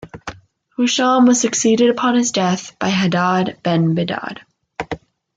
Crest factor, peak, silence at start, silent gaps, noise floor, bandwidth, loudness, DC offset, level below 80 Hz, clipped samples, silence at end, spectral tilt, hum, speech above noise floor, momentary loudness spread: 14 dB; -4 dBFS; 0 s; none; -39 dBFS; 9.4 kHz; -16 LUFS; under 0.1%; -54 dBFS; under 0.1%; 0.4 s; -4.5 dB/octave; none; 23 dB; 20 LU